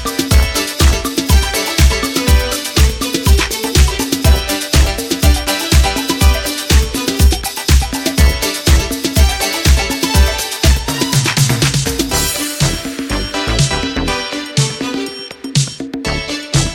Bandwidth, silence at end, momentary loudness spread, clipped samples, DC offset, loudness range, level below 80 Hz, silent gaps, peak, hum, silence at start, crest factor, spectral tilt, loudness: 17.5 kHz; 0 s; 5 LU; under 0.1%; under 0.1%; 4 LU; -16 dBFS; none; 0 dBFS; none; 0 s; 14 dB; -4 dB/octave; -14 LUFS